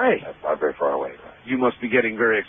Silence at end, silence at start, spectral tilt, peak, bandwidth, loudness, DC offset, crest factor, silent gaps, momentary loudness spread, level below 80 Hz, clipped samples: 0 s; 0 s; -3.5 dB/octave; -4 dBFS; 3.7 kHz; -23 LUFS; under 0.1%; 18 dB; none; 8 LU; -60 dBFS; under 0.1%